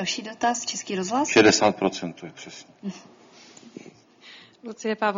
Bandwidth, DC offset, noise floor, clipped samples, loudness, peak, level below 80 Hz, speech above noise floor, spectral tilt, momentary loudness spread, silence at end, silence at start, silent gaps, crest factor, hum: 7.6 kHz; under 0.1%; -50 dBFS; under 0.1%; -22 LUFS; -4 dBFS; -64 dBFS; 26 dB; -3 dB/octave; 25 LU; 0 s; 0 s; none; 22 dB; none